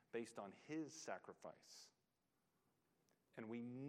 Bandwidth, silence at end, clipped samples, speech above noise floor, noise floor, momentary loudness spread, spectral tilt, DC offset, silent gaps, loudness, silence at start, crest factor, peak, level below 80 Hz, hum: 15 kHz; 0 s; under 0.1%; 35 dB; -88 dBFS; 12 LU; -5 dB/octave; under 0.1%; none; -54 LUFS; 0.15 s; 20 dB; -34 dBFS; under -90 dBFS; none